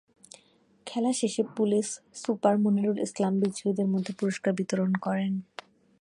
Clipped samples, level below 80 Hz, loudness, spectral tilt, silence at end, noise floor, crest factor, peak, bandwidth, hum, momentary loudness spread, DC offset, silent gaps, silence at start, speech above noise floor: under 0.1%; -74 dBFS; -28 LUFS; -6 dB/octave; 0.55 s; -63 dBFS; 20 dB; -10 dBFS; 11.5 kHz; none; 10 LU; under 0.1%; none; 0.85 s; 36 dB